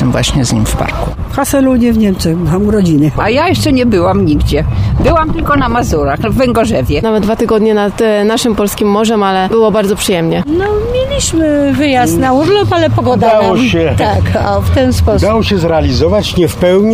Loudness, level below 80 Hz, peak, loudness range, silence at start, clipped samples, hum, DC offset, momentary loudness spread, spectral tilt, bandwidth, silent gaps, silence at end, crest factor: -11 LUFS; -22 dBFS; 0 dBFS; 1 LU; 0 s; under 0.1%; none; under 0.1%; 3 LU; -6 dB/octave; 16 kHz; none; 0 s; 10 dB